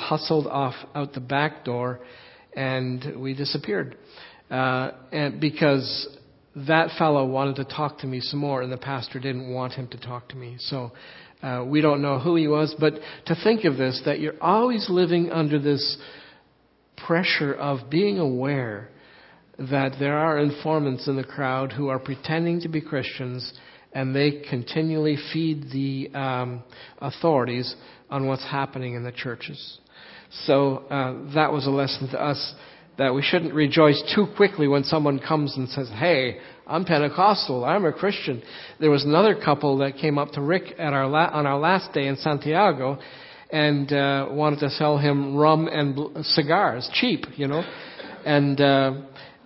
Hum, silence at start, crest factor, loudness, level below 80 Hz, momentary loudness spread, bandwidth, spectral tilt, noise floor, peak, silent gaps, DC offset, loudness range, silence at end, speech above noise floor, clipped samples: none; 0 s; 22 dB; -23 LUFS; -64 dBFS; 13 LU; 5.8 kHz; -10 dB/octave; -61 dBFS; -2 dBFS; none; under 0.1%; 6 LU; 0.15 s; 38 dB; under 0.1%